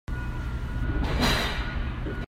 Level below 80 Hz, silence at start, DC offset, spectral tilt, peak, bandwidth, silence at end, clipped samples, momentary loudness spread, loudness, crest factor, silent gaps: -30 dBFS; 0.1 s; under 0.1%; -5 dB/octave; -12 dBFS; 16 kHz; 0 s; under 0.1%; 9 LU; -29 LUFS; 16 dB; none